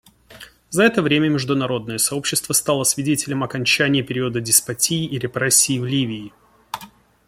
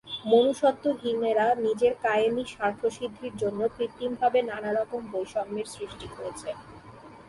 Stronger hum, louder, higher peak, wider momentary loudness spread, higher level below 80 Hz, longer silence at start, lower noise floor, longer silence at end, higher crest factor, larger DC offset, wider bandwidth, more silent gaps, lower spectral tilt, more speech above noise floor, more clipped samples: neither; first, -18 LUFS vs -27 LUFS; first, 0 dBFS vs -10 dBFS; second, 10 LU vs 14 LU; first, -56 dBFS vs -62 dBFS; first, 0.3 s vs 0.05 s; about the same, -45 dBFS vs -48 dBFS; first, 0.4 s vs 0.05 s; about the same, 20 dB vs 18 dB; neither; first, 16.5 kHz vs 11.5 kHz; neither; second, -3 dB/octave vs -4.5 dB/octave; first, 25 dB vs 21 dB; neither